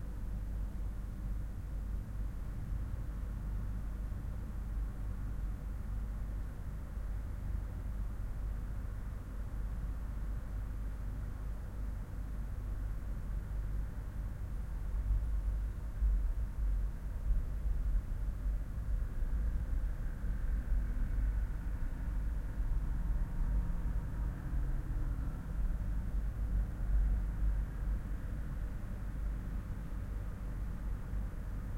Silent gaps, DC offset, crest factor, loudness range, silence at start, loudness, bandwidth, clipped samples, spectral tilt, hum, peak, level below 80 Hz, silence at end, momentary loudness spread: none; under 0.1%; 14 dB; 4 LU; 0 s; -41 LUFS; 3.8 kHz; under 0.1%; -8 dB/octave; none; -22 dBFS; -36 dBFS; 0 s; 6 LU